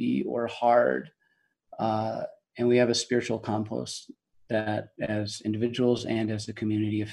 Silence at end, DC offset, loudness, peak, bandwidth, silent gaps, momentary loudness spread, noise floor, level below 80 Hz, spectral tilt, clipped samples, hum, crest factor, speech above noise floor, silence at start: 0 s; under 0.1%; -28 LUFS; -8 dBFS; 12 kHz; none; 11 LU; -72 dBFS; -66 dBFS; -5.5 dB/octave; under 0.1%; none; 20 dB; 45 dB; 0 s